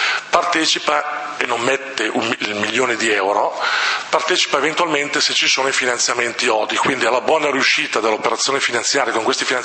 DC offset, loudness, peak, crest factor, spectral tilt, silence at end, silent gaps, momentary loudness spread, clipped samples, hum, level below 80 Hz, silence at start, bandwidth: under 0.1%; -17 LUFS; 0 dBFS; 18 dB; -1 dB/octave; 0 s; none; 5 LU; under 0.1%; none; -66 dBFS; 0 s; 8.8 kHz